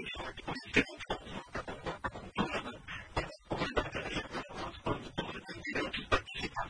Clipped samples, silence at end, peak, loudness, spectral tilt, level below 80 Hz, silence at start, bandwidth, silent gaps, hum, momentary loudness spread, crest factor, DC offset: under 0.1%; 0 s; -14 dBFS; -37 LUFS; -4.5 dB/octave; -50 dBFS; 0 s; 10.5 kHz; none; none; 10 LU; 24 dB; under 0.1%